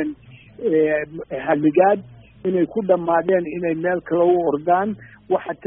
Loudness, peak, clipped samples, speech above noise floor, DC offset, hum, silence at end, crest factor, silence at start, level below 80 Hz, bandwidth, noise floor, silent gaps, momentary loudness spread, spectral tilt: -20 LUFS; -2 dBFS; under 0.1%; 23 dB; under 0.1%; none; 0 s; 18 dB; 0 s; -56 dBFS; 3.7 kHz; -42 dBFS; none; 11 LU; -2.5 dB/octave